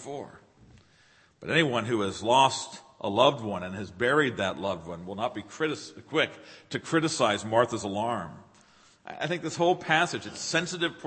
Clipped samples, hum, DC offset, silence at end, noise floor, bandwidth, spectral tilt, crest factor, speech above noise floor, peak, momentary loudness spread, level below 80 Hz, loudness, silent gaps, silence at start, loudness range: under 0.1%; none; under 0.1%; 0 s; -61 dBFS; 8.8 kHz; -4 dB/octave; 24 dB; 33 dB; -6 dBFS; 14 LU; -66 dBFS; -27 LUFS; none; 0 s; 4 LU